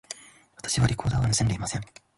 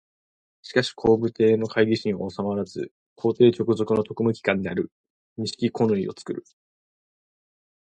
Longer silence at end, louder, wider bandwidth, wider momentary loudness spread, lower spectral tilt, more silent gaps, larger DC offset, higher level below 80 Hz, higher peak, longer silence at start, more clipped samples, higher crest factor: second, 0.35 s vs 1.4 s; about the same, -26 LUFS vs -24 LUFS; first, 11.5 kHz vs 9.2 kHz; about the same, 15 LU vs 15 LU; second, -4 dB/octave vs -6.5 dB/octave; second, none vs 2.91-3.16 s, 4.92-5.04 s, 5.10-5.36 s; neither; first, -42 dBFS vs -58 dBFS; second, -10 dBFS vs -4 dBFS; second, 0.1 s vs 0.65 s; neither; about the same, 16 dB vs 20 dB